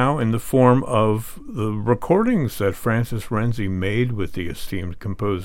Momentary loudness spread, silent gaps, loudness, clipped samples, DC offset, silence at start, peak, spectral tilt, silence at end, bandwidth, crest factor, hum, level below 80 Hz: 12 LU; none; -21 LUFS; under 0.1%; under 0.1%; 0 s; -2 dBFS; -7 dB/octave; 0 s; 17 kHz; 18 dB; none; -40 dBFS